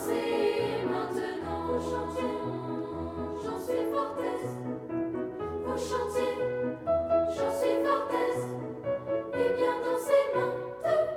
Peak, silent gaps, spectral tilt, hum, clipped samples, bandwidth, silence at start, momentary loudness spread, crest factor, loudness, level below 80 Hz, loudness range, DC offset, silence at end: -12 dBFS; none; -6 dB/octave; none; under 0.1%; 16.5 kHz; 0 s; 8 LU; 18 dB; -31 LUFS; -60 dBFS; 4 LU; under 0.1%; 0 s